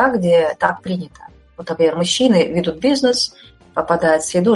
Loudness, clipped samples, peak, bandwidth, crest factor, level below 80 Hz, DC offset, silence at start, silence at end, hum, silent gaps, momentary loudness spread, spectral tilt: -17 LUFS; under 0.1%; 0 dBFS; 11.5 kHz; 16 dB; -50 dBFS; under 0.1%; 0 s; 0 s; none; none; 12 LU; -4.5 dB/octave